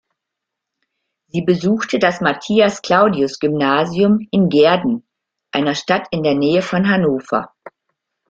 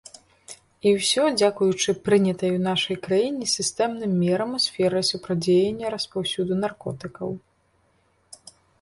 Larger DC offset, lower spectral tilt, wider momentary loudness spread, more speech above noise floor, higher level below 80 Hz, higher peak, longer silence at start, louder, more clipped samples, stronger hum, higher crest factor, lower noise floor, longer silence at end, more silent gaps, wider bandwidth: neither; first, -6 dB/octave vs -4.5 dB/octave; second, 8 LU vs 13 LU; first, 66 dB vs 42 dB; about the same, -56 dBFS vs -60 dBFS; first, -2 dBFS vs -6 dBFS; first, 1.35 s vs 0.5 s; first, -16 LUFS vs -23 LUFS; neither; neither; about the same, 16 dB vs 18 dB; first, -81 dBFS vs -65 dBFS; first, 0.6 s vs 0.45 s; neither; second, 7.8 kHz vs 11.5 kHz